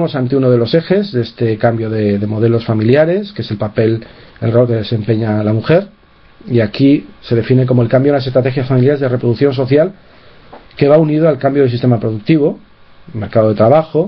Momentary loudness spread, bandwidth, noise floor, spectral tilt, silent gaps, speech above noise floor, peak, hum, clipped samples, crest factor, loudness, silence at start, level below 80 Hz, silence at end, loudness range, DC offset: 7 LU; 5.6 kHz; -38 dBFS; -10.5 dB/octave; none; 26 dB; 0 dBFS; none; under 0.1%; 12 dB; -13 LUFS; 0 s; -46 dBFS; 0 s; 2 LU; under 0.1%